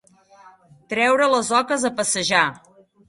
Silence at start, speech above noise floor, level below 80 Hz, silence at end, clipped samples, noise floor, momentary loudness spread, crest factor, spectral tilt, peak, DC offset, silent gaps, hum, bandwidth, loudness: 0.9 s; 30 dB; -64 dBFS; 0.5 s; under 0.1%; -50 dBFS; 6 LU; 20 dB; -2 dB/octave; -2 dBFS; under 0.1%; none; none; 11.5 kHz; -19 LUFS